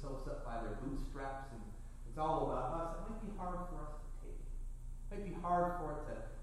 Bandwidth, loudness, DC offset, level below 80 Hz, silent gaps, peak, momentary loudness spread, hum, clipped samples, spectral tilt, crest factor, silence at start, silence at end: 12 kHz; -43 LUFS; under 0.1%; -46 dBFS; none; -24 dBFS; 16 LU; 60 Hz at -65 dBFS; under 0.1%; -7 dB/octave; 16 dB; 0 s; 0 s